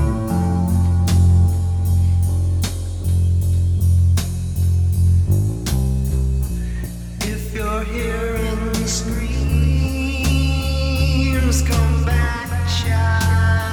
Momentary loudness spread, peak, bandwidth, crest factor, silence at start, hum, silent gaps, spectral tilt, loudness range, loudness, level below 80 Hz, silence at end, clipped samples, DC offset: 7 LU; -6 dBFS; 18 kHz; 12 dB; 0 s; none; none; -6 dB/octave; 5 LU; -19 LUFS; -22 dBFS; 0 s; under 0.1%; under 0.1%